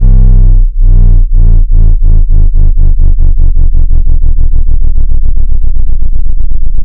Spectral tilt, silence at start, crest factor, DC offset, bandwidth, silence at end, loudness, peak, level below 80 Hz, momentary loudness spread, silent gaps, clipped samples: -12.5 dB/octave; 0 s; 2 dB; under 0.1%; 0.9 kHz; 0 s; -12 LUFS; 0 dBFS; -2 dBFS; 6 LU; none; 30%